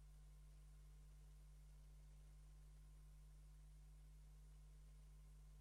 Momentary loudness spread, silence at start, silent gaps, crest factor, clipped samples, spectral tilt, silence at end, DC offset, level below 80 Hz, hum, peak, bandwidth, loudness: 0 LU; 0 s; none; 6 dB; under 0.1%; -5.5 dB/octave; 0 s; under 0.1%; -64 dBFS; 50 Hz at -65 dBFS; -56 dBFS; 12.5 kHz; -67 LUFS